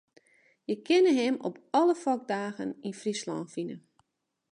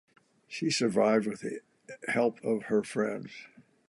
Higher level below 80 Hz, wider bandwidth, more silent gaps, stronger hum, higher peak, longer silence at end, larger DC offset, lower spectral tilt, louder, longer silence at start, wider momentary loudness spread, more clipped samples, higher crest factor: second, -82 dBFS vs -76 dBFS; about the same, 10.5 kHz vs 11.5 kHz; neither; neither; about the same, -14 dBFS vs -12 dBFS; first, 0.75 s vs 0.4 s; neither; about the same, -5 dB/octave vs -4.5 dB/octave; about the same, -29 LUFS vs -30 LUFS; first, 0.7 s vs 0.5 s; second, 14 LU vs 18 LU; neither; about the same, 16 dB vs 18 dB